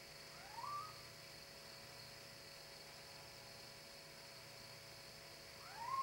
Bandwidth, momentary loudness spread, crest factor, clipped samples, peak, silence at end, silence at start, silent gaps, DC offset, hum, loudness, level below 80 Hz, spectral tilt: 16.5 kHz; 7 LU; 20 dB; under 0.1%; -34 dBFS; 0 s; 0 s; none; under 0.1%; none; -53 LUFS; -76 dBFS; -2 dB/octave